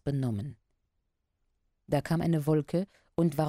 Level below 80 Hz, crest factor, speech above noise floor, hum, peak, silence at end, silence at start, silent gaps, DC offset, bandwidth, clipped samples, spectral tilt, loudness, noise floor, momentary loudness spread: -58 dBFS; 18 dB; 50 dB; none; -14 dBFS; 0 s; 0.05 s; none; under 0.1%; 16 kHz; under 0.1%; -8 dB/octave; -31 LUFS; -79 dBFS; 9 LU